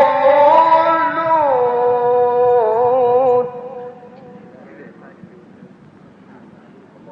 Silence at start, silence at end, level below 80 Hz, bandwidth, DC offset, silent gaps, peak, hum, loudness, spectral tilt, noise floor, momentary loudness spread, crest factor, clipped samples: 0 s; 0 s; -66 dBFS; 5.6 kHz; under 0.1%; none; -2 dBFS; none; -13 LUFS; -7 dB/octave; -43 dBFS; 16 LU; 14 dB; under 0.1%